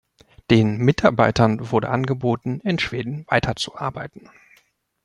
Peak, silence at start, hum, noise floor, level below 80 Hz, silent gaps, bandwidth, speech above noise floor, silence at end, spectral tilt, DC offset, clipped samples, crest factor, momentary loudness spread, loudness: -2 dBFS; 0.5 s; none; -61 dBFS; -46 dBFS; none; 11 kHz; 41 dB; 0.85 s; -6.5 dB/octave; under 0.1%; under 0.1%; 20 dB; 12 LU; -21 LUFS